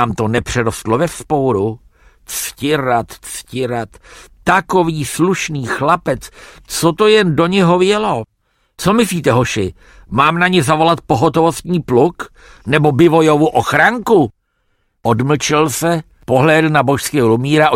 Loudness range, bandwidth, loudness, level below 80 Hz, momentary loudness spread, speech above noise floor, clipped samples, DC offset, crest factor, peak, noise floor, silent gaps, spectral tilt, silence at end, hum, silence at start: 5 LU; 16.5 kHz; -14 LUFS; -42 dBFS; 11 LU; 49 dB; under 0.1%; under 0.1%; 14 dB; 0 dBFS; -63 dBFS; none; -5 dB/octave; 0 s; none; 0 s